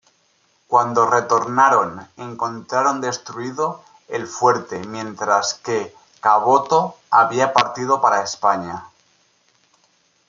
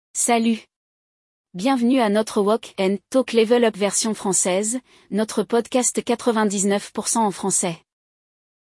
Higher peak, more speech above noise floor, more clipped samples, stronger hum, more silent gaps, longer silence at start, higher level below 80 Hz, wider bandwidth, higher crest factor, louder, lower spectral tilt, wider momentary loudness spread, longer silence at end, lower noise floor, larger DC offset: first, 0 dBFS vs -6 dBFS; second, 43 dB vs over 70 dB; neither; neither; second, none vs 0.76-1.44 s; first, 0.7 s vs 0.15 s; about the same, -68 dBFS vs -68 dBFS; second, 7.6 kHz vs 12 kHz; about the same, 18 dB vs 16 dB; about the same, -19 LUFS vs -20 LUFS; about the same, -3.5 dB/octave vs -3.5 dB/octave; first, 14 LU vs 7 LU; first, 1.4 s vs 0.85 s; second, -62 dBFS vs under -90 dBFS; neither